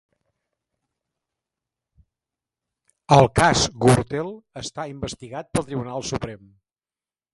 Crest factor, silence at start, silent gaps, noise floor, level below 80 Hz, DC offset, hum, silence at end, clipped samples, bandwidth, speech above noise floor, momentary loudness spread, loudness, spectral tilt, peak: 24 dB; 3.1 s; none; under -90 dBFS; -46 dBFS; under 0.1%; none; 0.95 s; under 0.1%; 11.5 kHz; over 69 dB; 17 LU; -21 LUFS; -5 dB/octave; 0 dBFS